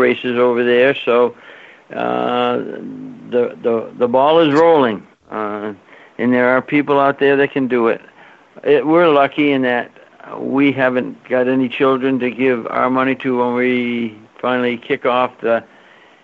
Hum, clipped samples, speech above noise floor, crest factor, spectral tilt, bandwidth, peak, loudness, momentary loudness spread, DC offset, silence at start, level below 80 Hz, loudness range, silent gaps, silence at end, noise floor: none; under 0.1%; 31 dB; 14 dB; -3.5 dB/octave; 7.4 kHz; -2 dBFS; -16 LUFS; 13 LU; under 0.1%; 0 s; -64 dBFS; 3 LU; none; 0.6 s; -46 dBFS